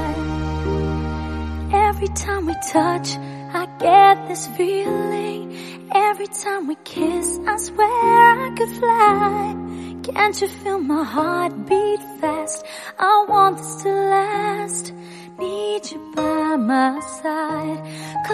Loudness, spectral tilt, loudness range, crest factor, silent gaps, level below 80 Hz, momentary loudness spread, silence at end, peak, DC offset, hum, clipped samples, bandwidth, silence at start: -19 LUFS; -4.5 dB/octave; 5 LU; 18 dB; none; -38 dBFS; 14 LU; 0 s; 0 dBFS; under 0.1%; none; under 0.1%; 13.5 kHz; 0 s